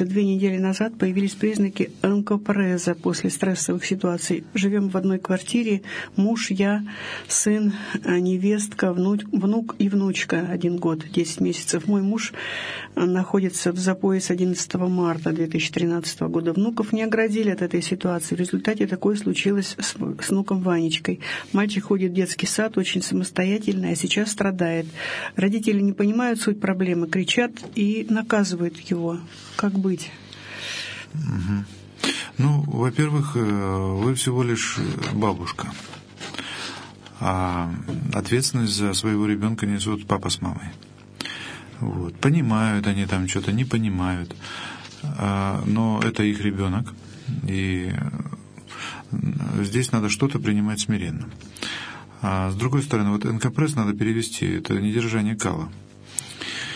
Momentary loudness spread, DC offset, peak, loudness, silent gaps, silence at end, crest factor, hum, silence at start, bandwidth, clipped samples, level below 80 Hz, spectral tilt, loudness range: 10 LU; under 0.1%; -2 dBFS; -23 LUFS; none; 0 s; 22 dB; none; 0 s; 11 kHz; under 0.1%; -56 dBFS; -5 dB/octave; 3 LU